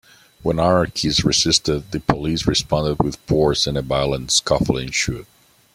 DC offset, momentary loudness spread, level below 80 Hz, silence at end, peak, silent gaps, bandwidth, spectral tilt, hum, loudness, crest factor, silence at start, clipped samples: under 0.1%; 7 LU; -38 dBFS; 0.5 s; -2 dBFS; none; 16 kHz; -4 dB/octave; none; -19 LUFS; 18 dB; 0.45 s; under 0.1%